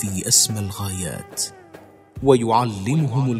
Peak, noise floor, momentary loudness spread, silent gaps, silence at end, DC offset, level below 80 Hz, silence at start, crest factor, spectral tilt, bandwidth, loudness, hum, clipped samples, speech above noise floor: 0 dBFS; -45 dBFS; 12 LU; none; 0 s; under 0.1%; -50 dBFS; 0 s; 20 dB; -4 dB/octave; 16 kHz; -20 LUFS; none; under 0.1%; 25 dB